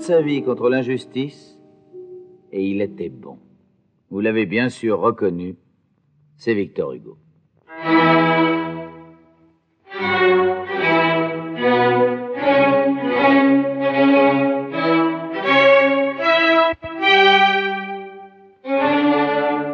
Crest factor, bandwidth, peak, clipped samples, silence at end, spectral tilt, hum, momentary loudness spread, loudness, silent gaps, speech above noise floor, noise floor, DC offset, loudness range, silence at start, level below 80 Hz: 16 dB; 9 kHz; -2 dBFS; under 0.1%; 0 s; -6.5 dB/octave; none; 15 LU; -17 LUFS; none; 41 dB; -62 dBFS; under 0.1%; 10 LU; 0 s; -62 dBFS